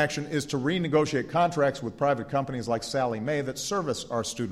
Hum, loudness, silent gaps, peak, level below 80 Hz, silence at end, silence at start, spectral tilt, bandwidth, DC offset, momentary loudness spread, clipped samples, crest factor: none; -28 LUFS; none; -12 dBFS; -58 dBFS; 0 s; 0 s; -5 dB/octave; 15 kHz; under 0.1%; 5 LU; under 0.1%; 16 dB